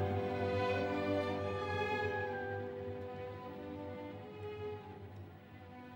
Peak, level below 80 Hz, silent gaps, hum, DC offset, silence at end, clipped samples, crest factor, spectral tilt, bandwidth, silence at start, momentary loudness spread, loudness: -24 dBFS; -70 dBFS; none; none; under 0.1%; 0 s; under 0.1%; 16 dB; -7 dB/octave; 16.5 kHz; 0 s; 16 LU; -39 LUFS